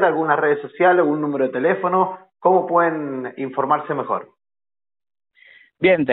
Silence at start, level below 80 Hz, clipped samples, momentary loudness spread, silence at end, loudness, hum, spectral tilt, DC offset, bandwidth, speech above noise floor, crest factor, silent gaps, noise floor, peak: 0 s; -66 dBFS; under 0.1%; 10 LU; 0 s; -19 LUFS; none; -4.5 dB/octave; under 0.1%; 4.1 kHz; over 72 dB; 16 dB; none; under -90 dBFS; -4 dBFS